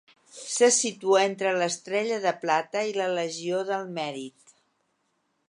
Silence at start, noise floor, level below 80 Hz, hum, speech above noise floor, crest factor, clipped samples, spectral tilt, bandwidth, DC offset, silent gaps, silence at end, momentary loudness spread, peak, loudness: 0.35 s; -74 dBFS; -84 dBFS; none; 48 dB; 20 dB; under 0.1%; -2.5 dB/octave; 11.5 kHz; under 0.1%; none; 1.2 s; 12 LU; -8 dBFS; -26 LUFS